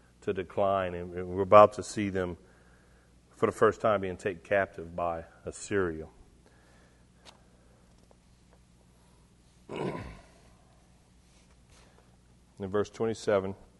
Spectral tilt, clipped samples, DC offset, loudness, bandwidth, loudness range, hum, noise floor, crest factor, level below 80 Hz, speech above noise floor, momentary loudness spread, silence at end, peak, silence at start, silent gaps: -6 dB/octave; under 0.1%; under 0.1%; -29 LUFS; 11.5 kHz; 18 LU; 60 Hz at -60 dBFS; -61 dBFS; 28 dB; -60 dBFS; 32 dB; 20 LU; 0.25 s; -4 dBFS; 0.25 s; none